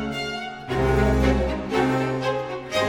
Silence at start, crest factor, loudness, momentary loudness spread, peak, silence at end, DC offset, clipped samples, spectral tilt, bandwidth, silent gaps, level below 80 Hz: 0 s; 16 dB; -23 LUFS; 9 LU; -8 dBFS; 0 s; under 0.1%; under 0.1%; -6 dB/octave; 16.5 kHz; none; -30 dBFS